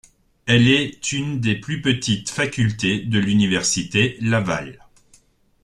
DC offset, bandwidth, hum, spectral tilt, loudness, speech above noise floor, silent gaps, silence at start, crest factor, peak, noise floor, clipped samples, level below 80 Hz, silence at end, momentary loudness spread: under 0.1%; 12 kHz; none; -4.5 dB/octave; -20 LUFS; 37 dB; none; 0.45 s; 18 dB; -2 dBFS; -56 dBFS; under 0.1%; -50 dBFS; 0.9 s; 8 LU